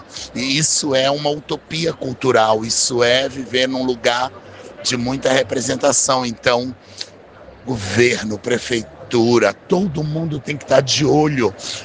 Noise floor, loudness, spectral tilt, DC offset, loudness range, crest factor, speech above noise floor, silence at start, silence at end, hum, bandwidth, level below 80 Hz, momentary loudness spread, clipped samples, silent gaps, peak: -41 dBFS; -17 LUFS; -3.5 dB/octave; under 0.1%; 2 LU; 18 dB; 23 dB; 0 s; 0 s; none; 10.5 kHz; -50 dBFS; 11 LU; under 0.1%; none; 0 dBFS